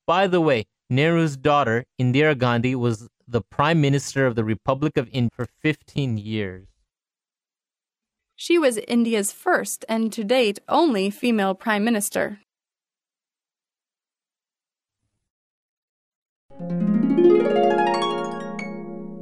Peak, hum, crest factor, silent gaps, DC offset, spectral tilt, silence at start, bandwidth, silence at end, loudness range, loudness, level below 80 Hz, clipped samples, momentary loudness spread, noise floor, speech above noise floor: -6 dBFS; none; 18 dB; 15.30-16.49 s; under 0.1%; -5.5 dB/octave; 0.1 s; 15.5 kHz; 0 s; 8 LU; -22 LUFS; -58 dBFS; under 0.1%; 10 LU; under -90 dBFS; over 69 dB